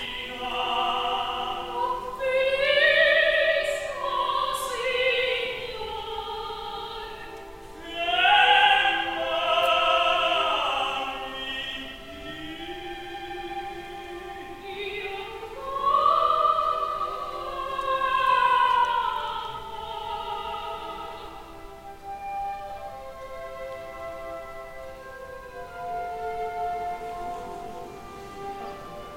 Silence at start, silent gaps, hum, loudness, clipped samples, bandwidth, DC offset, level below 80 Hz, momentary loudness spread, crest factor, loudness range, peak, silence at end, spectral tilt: 0 s; none; none; -25 LUFS; under 0.1%; 16 kHz; under 0.1%; -50 dBFS; 19 LU; 20 dB; 15 LU; -6 dBFS; 0 s; -2.5 dB/octave